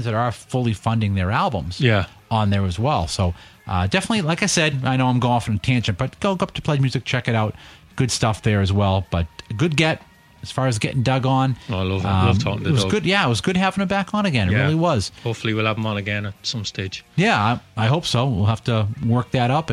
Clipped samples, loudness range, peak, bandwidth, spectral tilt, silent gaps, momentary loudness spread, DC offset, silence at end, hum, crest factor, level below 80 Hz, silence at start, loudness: under 0.1%; 2 LU; -2 dBFS; 12.5 kHz; -5.5 dB/octave; none; 7 LU; under 0.1%; 0 s; none; 18 dB; -44 dBFS; 0 s; -21 LUFS